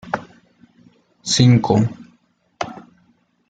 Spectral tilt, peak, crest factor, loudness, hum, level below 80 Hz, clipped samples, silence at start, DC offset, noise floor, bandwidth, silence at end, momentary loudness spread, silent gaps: -5.5 dB/octave; -2 dBFS; 20 dB; -18 LUFS; none; -52 dBFS; under 0.1%; 0.05 s; under 0.1%; -60 dBFS; 9.2 kHz; 0.75 s; 17 LU; none